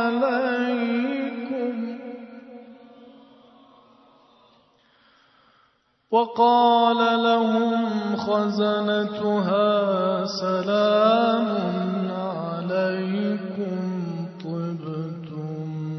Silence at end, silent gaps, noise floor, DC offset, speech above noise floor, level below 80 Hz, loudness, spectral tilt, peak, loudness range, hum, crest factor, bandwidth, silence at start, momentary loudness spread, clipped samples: 0 s; none; -64 dBFS; under 0.1%; 44 dB; -72 dBFS; -23 LUFS; -7 dB/octave; -6 dBFS; 11 LU; none; 18 dB; 6.2 kHz; 0 s; 13 LU; under 0.1%